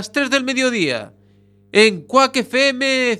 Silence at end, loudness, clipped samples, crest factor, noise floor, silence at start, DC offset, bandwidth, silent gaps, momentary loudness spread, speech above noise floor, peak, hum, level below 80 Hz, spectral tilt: 0 s; -16 LUFS; under 0.1%; 18 dB; -52 dBFS; 0 s; under 0.1%; 14 kHz; none; 6 LU; 35 dB; 0 dBFS; 50 Hz at -50 dBFS; -66 dBFS; -3 dB/octave